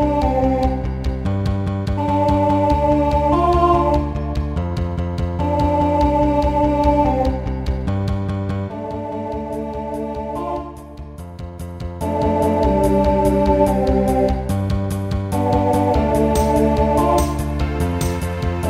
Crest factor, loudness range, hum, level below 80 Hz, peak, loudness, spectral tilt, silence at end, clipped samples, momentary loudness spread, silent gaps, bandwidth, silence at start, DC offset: 16 dB; 7 LU; none; -26 dBFS; -2 dBFS; -19 LUFS; -7.5 dB/octave; 0 s; under 0.1%; 10 LU; none; 15.5 kHz; 0 s; under 0.1%